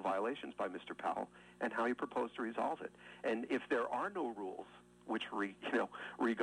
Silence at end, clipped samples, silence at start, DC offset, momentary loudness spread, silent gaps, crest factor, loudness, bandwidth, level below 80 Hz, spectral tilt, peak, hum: 0 s; under 0.1%; 0 s; under 0.1%; 9 LU; none; 16 dB; -40 LUFS; 11.5 kHz; -78 dBFS; -5 dB/octave; -24 dBFS; 60 Hz at -65 dBFS